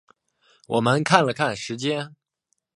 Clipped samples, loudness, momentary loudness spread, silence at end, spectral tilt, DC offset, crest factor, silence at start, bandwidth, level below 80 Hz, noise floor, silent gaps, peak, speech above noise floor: under 0.1%; -22 LUFS; 10 LU; 0.7 s; -5 dB/octave; under 0.1%; 24 dB; 0.7 s; 11.5 kHz; -64 dBFS; -75 dBFS; none; 0 dBFS; 53 dB